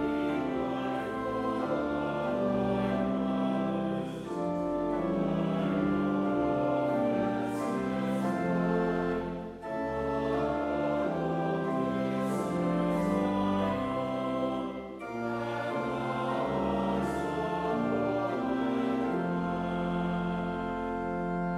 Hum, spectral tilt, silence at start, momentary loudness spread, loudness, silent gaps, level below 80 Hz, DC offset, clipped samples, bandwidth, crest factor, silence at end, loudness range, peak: none; -7.5 dB/octave; 0 s; 5 LU; -31 LUFS; none; -54 dBFS; under 0.1%; under 0.1%; 13.5 kHz; 12 dB; 0 s; 2 LU; -18 dBFS